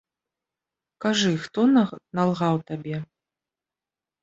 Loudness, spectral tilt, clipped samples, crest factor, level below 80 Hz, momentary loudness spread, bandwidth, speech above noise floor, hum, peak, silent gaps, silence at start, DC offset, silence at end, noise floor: -24 LUFS; -5.5 dB/octave; under 0.1%; 18 dB; -66 dBFS; 12 LU; 8 kHz; over 67 dB; none; -8 dBFS; none; 1 s; under 0.1%; 1.2 s; under -90 dBFS